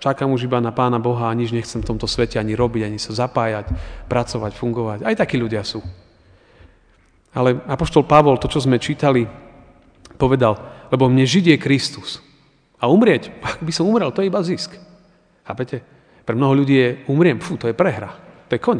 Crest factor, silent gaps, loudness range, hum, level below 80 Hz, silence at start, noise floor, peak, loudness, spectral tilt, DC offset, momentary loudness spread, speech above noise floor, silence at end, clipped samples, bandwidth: 18 dB; none; 5 LU; none; -40 dBFS; 0 s; -55 dBFS; 0 dBFS; -18 LUFS; -6.5 dB/octave; under 0.1%; 14 LU; 37 dB; 0 s; under 0.1%; 10 kHz